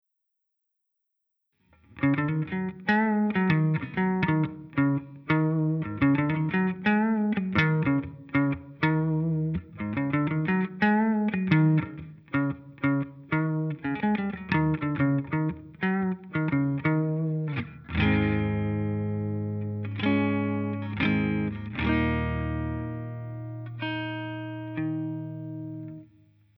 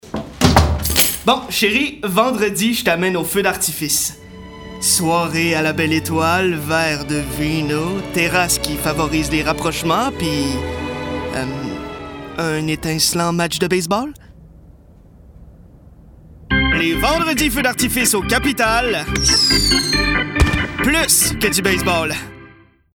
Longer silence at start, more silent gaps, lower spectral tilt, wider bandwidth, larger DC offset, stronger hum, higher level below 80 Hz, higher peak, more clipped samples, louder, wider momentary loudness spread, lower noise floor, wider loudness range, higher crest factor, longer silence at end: first, 1.95 s vs 0.05 s; neither; first, -10 dB/octave vs -3.5 dB/octave; second, 5.8 kHz vs over 20 kHz; neither; neither; second, -48 dBFS vs -30 dBFS; second, -8 dBFS vs 0 dBFS; neither; second, -27 LUFS vs -16 LUFS; about the same, 10 LU vs 10 LU; first, -81 dBFS vs -46 dBFS; about the same, 5 LU vs 7 LU; about the same, 20 dB vs 18 dB; first, 0.55 s vs 0.4 s